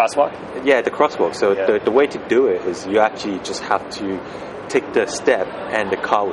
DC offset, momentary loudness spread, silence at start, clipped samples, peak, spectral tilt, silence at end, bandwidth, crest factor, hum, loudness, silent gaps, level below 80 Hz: under 0.1%; 9 LU; 0 s; under 0.1%; 0 dBFS; -4 dB/octave; 0 s; 11.5 kHz; 18 dB; none; -19 LUFS; none; -56 dBFS